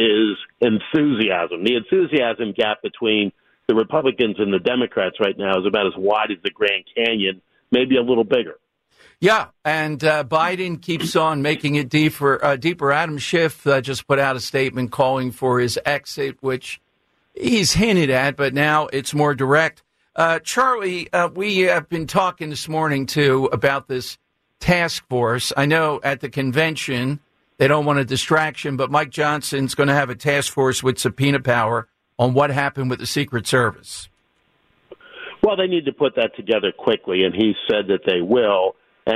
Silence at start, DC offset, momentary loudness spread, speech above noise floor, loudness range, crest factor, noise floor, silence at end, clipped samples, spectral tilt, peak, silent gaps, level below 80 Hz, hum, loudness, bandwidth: 0 s; under 0.1%; 6 LU; 47 dB; 2 LU; 16 dB; -66 dBFS; 0 s; under 0.1%; -5 dB/octave; -4 dBFS; none; -50 dBFS; none; -19 LUFS; 14 kHz